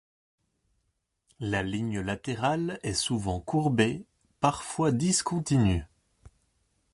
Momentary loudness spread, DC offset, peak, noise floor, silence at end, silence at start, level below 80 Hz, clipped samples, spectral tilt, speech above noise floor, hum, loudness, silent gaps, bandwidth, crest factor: 7 LU; under 0.1%; -10 dBFS; -77 dBFS; 0.65 s; 1.4 s; -48 dBFS; under 0.1%; -5 dB/octave; 50 dB; none; -28 LUFS; none; 11.5 kHz; 20 dB